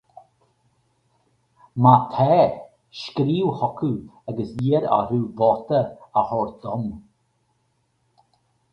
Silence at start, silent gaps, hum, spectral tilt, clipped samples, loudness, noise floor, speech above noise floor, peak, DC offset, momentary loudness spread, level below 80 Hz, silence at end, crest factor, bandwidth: 1.75 s; none; none; -9 dB/octave; under 0.1%; -21 LUFS; -69 dBFS; 48 dB; 0 dBFS; under 0.1%; 16 LU; -56 dBFS; 1.7 s; 22 dB; 6.6 kHz